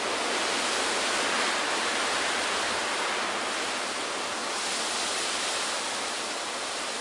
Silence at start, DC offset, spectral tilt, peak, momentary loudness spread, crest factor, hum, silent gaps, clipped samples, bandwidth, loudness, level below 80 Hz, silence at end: 0 s; under 0.1%; 0 dB/octave; -14 dBFS; 4 LU; 14 dB; none; none; under 0.1%; 11.5 kHz; -27 LUFS; -68 dBFS; 0 s